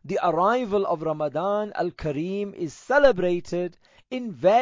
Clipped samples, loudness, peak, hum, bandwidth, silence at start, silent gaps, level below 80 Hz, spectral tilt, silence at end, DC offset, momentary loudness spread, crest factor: under 0.1%; -24 LUFS; -6 dBFS; none; 7.6 kHz; 0.05 s; none; -52 dBFS; -6.5 dB/octave; 0 s; under 0.1%; 14 LU; 18 dB